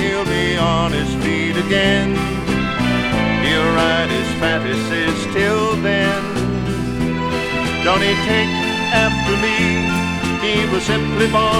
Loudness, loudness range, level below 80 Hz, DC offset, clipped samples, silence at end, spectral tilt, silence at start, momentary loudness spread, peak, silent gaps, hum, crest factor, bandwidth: -17 LUFS; 2 LU; -34 dBFS; under 0.1%; under 0.1%; 0 s; -5 dB/octave; 0 s; 5 LU; 0 dBFS; none; none; 16 dB; 16.5 kHz